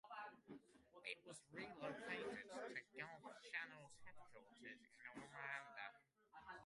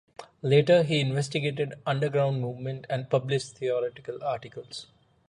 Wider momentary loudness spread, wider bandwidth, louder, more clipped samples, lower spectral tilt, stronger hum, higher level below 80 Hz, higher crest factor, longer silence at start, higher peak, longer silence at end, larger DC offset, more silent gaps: about the same, 14 LU vs 14 LU; about the same, 11.5 kHz vs 11 kHz; second, -54 LUFS vs -27 LUFS; neither; second, -3.5 dB/octave vs -6 dB/octave; neither; second, -88 dBFS vs -66 dBFS; about the same, 22 dB vs 18 dB; second, 0.05 s vs 0.2 s; second, -34 dBFS vs -8 dBFS; second, 0 s vs 0.45 s; neither; neither